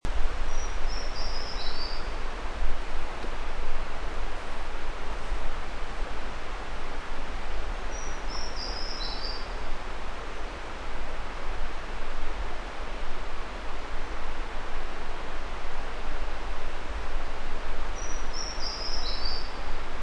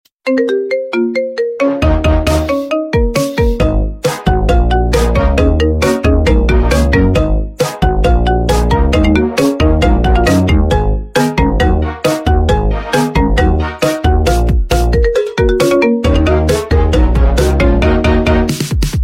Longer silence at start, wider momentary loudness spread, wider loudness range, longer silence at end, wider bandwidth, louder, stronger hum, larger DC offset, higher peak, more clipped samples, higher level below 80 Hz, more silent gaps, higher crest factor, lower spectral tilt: second, 0.05 s vs 0.25 s; about the same, 5 LU vs 4 LU; about the same, 3 LU vs 2 LU; about the same, 0 s vs 0 s; second, 7 kHz vs 16 kHz; second, -36 LUFS vs -13 LUFS; neither; neither; second, -10 dBFS vs 0 dBFS; neither; second, -30 dBFS vs -14 dBFS; neither; about the same, 14 dB vs 10 dB; second, -3.5 dB/octave vs -6.5 dB/octave